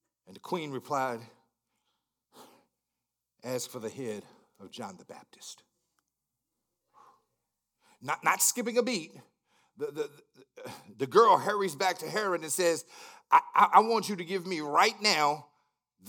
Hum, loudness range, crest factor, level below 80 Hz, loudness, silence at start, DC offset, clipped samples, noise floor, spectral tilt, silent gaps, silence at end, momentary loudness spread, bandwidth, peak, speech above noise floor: none; 18 LU; 26 dB; under -90 dBFS; -28 LUFS; 0.3 s; under 0.1%; under 0.1%; -87 dBFS; -2.5 dB/octave; none; 0.65 s; 24 LU; 19 kHz; -6 dBFS; 58 dB